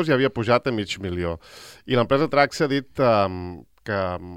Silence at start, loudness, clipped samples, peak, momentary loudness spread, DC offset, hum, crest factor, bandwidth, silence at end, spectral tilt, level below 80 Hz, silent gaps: 0 s; -22 LUFS; under 0.1%; -4 dBFS; 16 LU; under 0.1%; none; 18 dB; 16 kHz; 0 s; -6 dB/octave; -54 dBFS; none